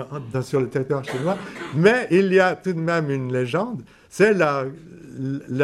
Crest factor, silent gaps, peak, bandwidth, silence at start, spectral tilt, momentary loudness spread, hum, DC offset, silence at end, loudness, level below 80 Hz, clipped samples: 18 dB; none; -4 dBFS; 12.5 kHz; 0 s; -6.5 dB/octave; 14 LU; none; under 0.1%; 0 s; -21 LUFS; -60 dBFS; under 0.1%